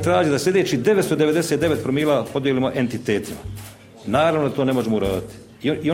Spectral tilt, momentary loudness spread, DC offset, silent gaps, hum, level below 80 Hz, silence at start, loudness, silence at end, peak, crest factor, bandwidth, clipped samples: -5.5 dB/octave; 15 LU; under 0.1%; none; none; -48 dBFS; 0 s; -20 LUFS; 0 s; -4 dBFS; 16 dB; 16.5 kHz; under 0.1%